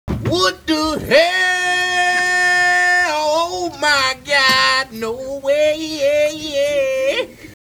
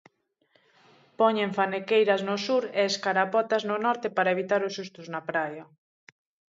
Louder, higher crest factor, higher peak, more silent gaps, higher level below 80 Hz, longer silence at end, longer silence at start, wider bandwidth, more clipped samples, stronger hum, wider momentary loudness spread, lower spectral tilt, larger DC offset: first, -15 LUFS vs -26 LUFS; about the same, 16 dB vs 20 dB; first, 0 dBFS vs -8 dBFS; neither; first, -44 dBFS vs -80 dBFS; second, 0.15 s vs 0.85 s; second, 0.05 s vs 1.2 s; first, over 20 kHz vs 7.8 kHz; neither; neither; about the same, 8 LU vs 10 LU; second, -2.5 dB/octave vs -4.5 dB/octave; neither